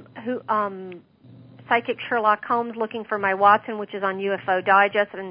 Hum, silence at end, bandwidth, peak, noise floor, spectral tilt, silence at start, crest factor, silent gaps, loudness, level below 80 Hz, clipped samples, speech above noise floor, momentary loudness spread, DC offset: none; 0 s; 5.2 kHz; -4 dBFS; -48 dBFS; -9 dB/octave; 0 s; 20 dB; none; -22 LUFS; -72 dBFS; under 0.1%; 25 dB; 13 LU; under 0.1%